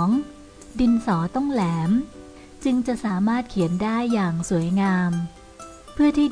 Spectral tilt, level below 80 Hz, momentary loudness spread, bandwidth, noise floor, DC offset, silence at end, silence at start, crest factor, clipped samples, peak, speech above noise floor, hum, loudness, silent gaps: -7 dB/octave; -46 dBFS; 17 LU; 10.5 kHz; -43 dBFS; under 0.1%; 0 s; 0 s; 12 dB; under 0.1%; -10 dBFS; 22 dB; none; -23 LUFS; none